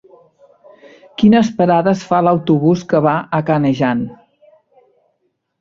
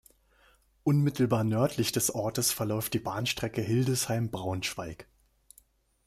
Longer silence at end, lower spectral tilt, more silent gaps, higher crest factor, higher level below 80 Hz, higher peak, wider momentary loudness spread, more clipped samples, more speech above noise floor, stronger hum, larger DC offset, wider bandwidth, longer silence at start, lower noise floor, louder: first, 1.45 s vs 1.05 s; first, -7.5 dB/octave vs -4.5 dB/octave; neither; about the same, 16 dB vs 18 dB; first, -54 dBFS vs -60 dBFS; first, -2 dBFS vs -14 dBFS; about the same, 6 LU vs 7 LU; neither; first, 54 dB vs 35 dB; neither; neither; second, 7.6 kHz vs 16 kHz; first, 1.2 s vs 0.85 s; first, -68 dBFS vs -64 dBFS; first, -14 LUFS vs -29 LUFS